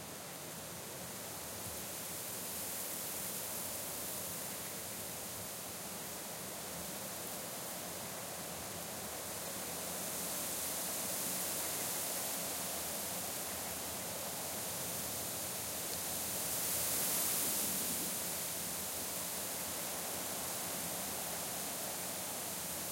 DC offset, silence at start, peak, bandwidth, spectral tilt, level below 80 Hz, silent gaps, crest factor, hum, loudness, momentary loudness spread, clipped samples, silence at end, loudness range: under 0.1%; 0 s; -22 dBFS; 16.5 kHz; -1.5 dB/octave; -70 dBFS; none; 18 dB; none; -38 LUFS; 8 LU; under 0.1%; 0 s; 7 LU